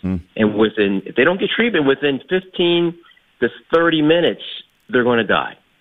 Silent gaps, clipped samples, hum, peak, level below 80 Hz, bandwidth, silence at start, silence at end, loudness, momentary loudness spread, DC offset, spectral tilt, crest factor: none; under 0.1%; none; -2 dBFS; -50 dBFS; 4.4 kHz; 0.05 s; 0.3 s; -17 LUFS; 8 LU; 0.1%; -8 dB/octave; 16 dB